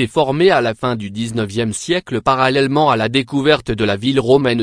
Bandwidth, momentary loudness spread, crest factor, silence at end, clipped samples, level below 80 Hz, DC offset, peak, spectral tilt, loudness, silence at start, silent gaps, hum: 10.5 kHz; 8 LU; 16 dB; 0 s; under 0.1%; -44 dBFS; under 0.1%; 0 dBFS; -5.5 dB/octave; -16 LUFS; 0 s; none; none